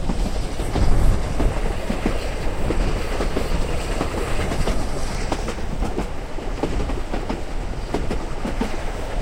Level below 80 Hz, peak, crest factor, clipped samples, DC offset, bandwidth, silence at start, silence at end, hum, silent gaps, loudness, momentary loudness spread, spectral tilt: -24 dBFS; -4 dBFS; 16 dB; under 0.1%; under 0.1%; 15 kHz; 0 s; 0 s; none; none; -26 LUFS; 6 LU; -5.5 dB/octave